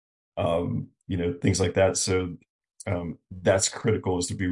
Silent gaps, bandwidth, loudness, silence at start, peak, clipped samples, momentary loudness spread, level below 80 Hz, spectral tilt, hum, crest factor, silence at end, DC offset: 2.50-2.59 s; 11.5 kHz; -26 LUFS; 0.35 s; -8 dBFS; under 0.1%; 13 LU; -58 dBFS; -4.5 dB/octave; none; 18 dB; 0 s; under 0.1%